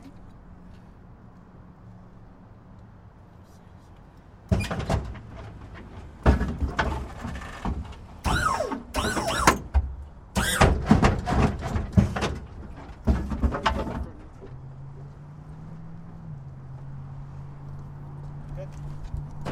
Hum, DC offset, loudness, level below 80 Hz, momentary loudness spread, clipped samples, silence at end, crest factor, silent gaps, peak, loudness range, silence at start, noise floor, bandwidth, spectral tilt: none; under 0.1%; -26 LUFS; -34 dBFS; 26 LU; under 0.1%; 0 s; 28 dB; none; 0 dBFS; 17 LU; 0 s; -49 dBFS; 16 kHz; -5.5 dB/octave